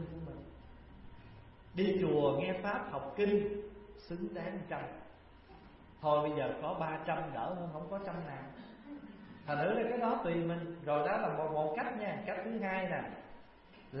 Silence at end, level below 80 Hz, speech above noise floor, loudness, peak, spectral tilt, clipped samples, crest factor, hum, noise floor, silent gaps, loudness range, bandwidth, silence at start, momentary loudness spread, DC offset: 0 s; -62 dBFS; 22 dB; -36 LUFS; -18 dBFS; -5.5 dB/octave; under 0.1%; 20 dB; none; -58 dBFS; none; 4 LU; 5.6 kHz; 0 s; 22 LU; under 0.1%